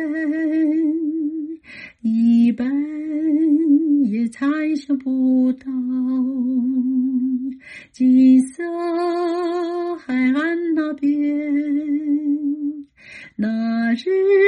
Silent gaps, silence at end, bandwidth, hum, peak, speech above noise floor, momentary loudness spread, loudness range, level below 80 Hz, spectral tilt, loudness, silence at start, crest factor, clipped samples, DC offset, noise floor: none; 0 s; 10 kHz; none; -6 dBFS; 25 dB; 10 LU; 3 LU; -66 dBFS; -7 dB/octave; -19 LUFS; 0 s; 14 dB; under 0.1%; under 0.1%; -42 dBFS